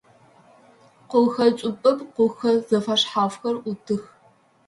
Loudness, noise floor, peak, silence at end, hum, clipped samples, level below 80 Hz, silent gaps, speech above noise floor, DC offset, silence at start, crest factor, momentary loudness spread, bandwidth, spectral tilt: -22 LUFS; -58 dBFS; -6 dBFS; 0.65 s; none; under 0.1%; -68 dBFS; none; 37 dB; under 0.1%; 1.1 s; 18 dB; 9 LU; 11.5 kHz; -5 dB/octave